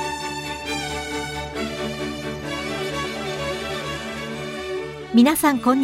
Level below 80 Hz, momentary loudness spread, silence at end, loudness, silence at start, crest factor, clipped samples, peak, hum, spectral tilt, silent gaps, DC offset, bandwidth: -46 dBFS; 13 LU; 0 s; -24 LUFS; 0 s; 20 dB; under 0.1%; -4 dBFS; none; -4 dB/octave; none; under 0.1%; 16 kHz